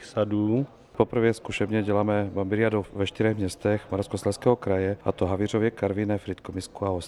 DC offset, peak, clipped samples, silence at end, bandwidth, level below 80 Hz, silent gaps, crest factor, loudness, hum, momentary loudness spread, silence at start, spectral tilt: under 0.1%; -6 dBFS; under 0.1%; 0 s; 12.5 kHz; -54 dBFS; none; 20 dB; -26 LUFS; none; 6 LU; 0 s; -7 dB/octave